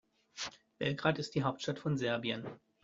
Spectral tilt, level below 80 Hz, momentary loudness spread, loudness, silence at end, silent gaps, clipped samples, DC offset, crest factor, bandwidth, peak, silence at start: -4.5 dB/octave; -70 dBFS; 10 LU; -36 LUFS; 0.25 s; none; under 0.1%; under 0.1%; 24 dB; 7.8 kHz; -14 dBFS; 0.35 s